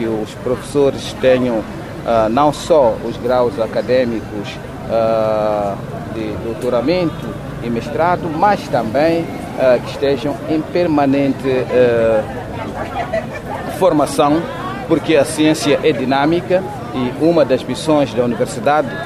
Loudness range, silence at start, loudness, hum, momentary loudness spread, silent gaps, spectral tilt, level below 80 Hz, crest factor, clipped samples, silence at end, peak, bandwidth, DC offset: 3 LU; 0 s; -16 LUFS; none; 11 LU; none; -6 dB/octave; -40 dBFS; 14 dB; under 0.1%; 0 s; -2 dBFS; 15 kHz; under 0.1%